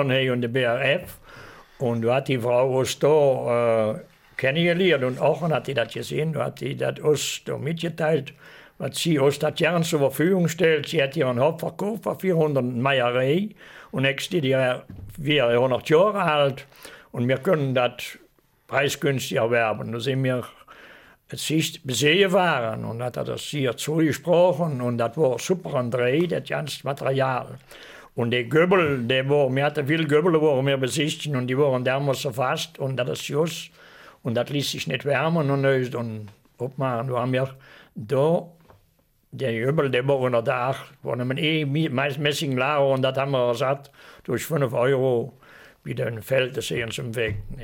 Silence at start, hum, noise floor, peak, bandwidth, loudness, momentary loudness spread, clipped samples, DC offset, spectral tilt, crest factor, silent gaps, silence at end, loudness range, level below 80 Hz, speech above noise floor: 0 s; none; -63 dBFS; -6 dBFS; 17 kHz; -23 LUFS; 10 LU; under 0.1%; under 0.1%; -5.5 dB/octave; 18 dB; none; 0 s; 4 LU; -56 dBFS; 41 dB